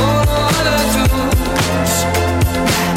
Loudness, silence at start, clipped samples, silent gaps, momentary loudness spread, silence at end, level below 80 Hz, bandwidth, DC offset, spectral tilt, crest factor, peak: -15 LUFS; 0 s; under 0.1%; none; 2 LU; 0 s; -22 dBFS; 17 kHz; under 0.1%; -4.5 dB/octave; 10 dB; -4 dBFS